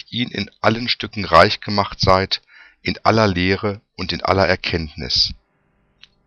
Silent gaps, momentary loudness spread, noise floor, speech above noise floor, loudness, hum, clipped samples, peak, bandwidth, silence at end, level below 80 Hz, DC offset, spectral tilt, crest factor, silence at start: none; 10 LU; -63 dBFS; 45 dB; -18 LUFS; 50 Hz at -45 dBFS; under 0.1%; 0 dBFS; 11 kHz; 0.9 s; -40 dBFS; under 0.1%; -5 dB/octave; 20 dB; 0.1 s